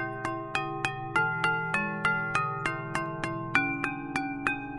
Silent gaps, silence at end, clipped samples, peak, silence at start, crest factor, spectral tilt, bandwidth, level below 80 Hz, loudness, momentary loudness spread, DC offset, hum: none; 0 s; under 0.1%; -8 dBFS; 0 s; 22 dB; -5 dB/octave; 11.5 kHz; -56 dBFS; -30 LUFS; 6 LU; under 0.1%; none